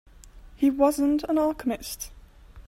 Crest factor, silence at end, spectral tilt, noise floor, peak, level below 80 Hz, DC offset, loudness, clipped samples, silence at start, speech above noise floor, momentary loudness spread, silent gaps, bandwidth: 18 dB; 0.05 s; -4.5 dB/octave; -48 dBFS; -10 dBFS; -48 dBFS; under 0.1%; -25 LUFS; under 0.1%; 0.35 s; 24 dB; 14 LU; none; 16 kHz